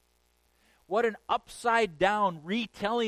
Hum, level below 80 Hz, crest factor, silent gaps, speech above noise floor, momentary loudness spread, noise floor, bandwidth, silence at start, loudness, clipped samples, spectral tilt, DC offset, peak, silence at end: none; -62 dBFS; 18 dB; none; 41 dB; 6 LU; -70 dBFS; 14.5 kHz; 0.9 s; -29 LUFS; under 0.1%; -4.5 dB/octave; under 0.1%; -12 dBFS; 0 s